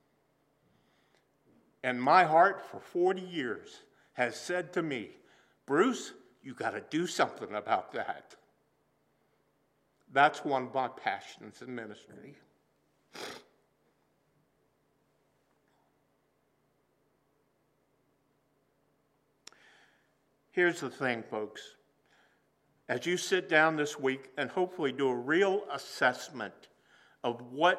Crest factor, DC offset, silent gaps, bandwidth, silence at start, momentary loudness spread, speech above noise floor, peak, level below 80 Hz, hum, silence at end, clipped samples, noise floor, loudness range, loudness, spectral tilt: 26 dB; under 0.1%; none; 14.5 kHz; 1.85 s; 19 LU; 43 dB; -10 dBFS; -88 dBFS; 60 Hz at -75 dBFS; 0 s; under 0.1%; -74 dBFS; 18 LU; -31 LUFS; -4 dB/octave